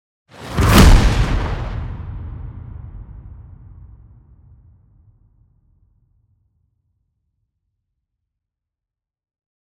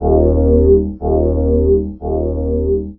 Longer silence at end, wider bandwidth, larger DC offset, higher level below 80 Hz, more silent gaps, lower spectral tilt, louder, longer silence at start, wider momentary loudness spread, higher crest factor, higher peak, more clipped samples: first, 6.35 s vs 0.05 s; first, 16 kHz vs 1.5 kHz; neither; about the same, -22 dBFS vs -20 dBFS; neither; second, -5.5 dB/octave vs -16.5 dB/octave; about the same, -16 LUFS vs -15 LUFS; first, 0.4 s vs 0 s; first, 28 LU vs 7 LU; first, 20 dB vs 14 dB; about the same, -2 dBFS vs 0 dBFS; neither